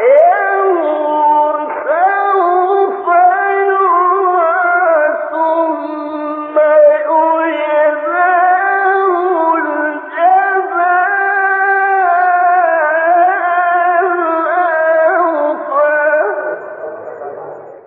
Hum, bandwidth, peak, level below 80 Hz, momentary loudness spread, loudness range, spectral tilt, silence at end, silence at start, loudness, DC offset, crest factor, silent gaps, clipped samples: none; 4.1 kHz; 0 dBFS; -76 dBFS; 8 LU; 2 LU; -7 dB/octave; 0.1 s; 0 s; -12 LUFS; under 0.1%; 12 dB; none; under 0.1%